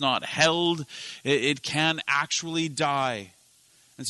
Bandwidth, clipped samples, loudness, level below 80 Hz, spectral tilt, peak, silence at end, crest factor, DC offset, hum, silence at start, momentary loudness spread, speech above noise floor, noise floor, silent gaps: 12 kHz; under 0.1%; -25 LUFS; -68 dBFS; -3 dB/octave; -6 dBFS; 0 s; 20 dB; under 0.1%; none; 0 s; 10 LU; 33 dB; -60 dBFS; none